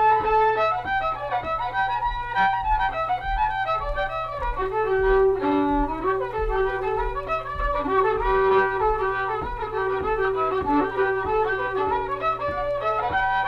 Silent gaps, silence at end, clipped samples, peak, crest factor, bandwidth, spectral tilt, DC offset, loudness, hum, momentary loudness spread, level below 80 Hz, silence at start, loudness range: none; 0 s; under 0.1%; -8 dBFS; 14 dB; 6.4 kHz; -7 dB/octave; under 0.1%; -23 LUFS; none; 7 LU; -36 dBFS; 0 s; 1 LU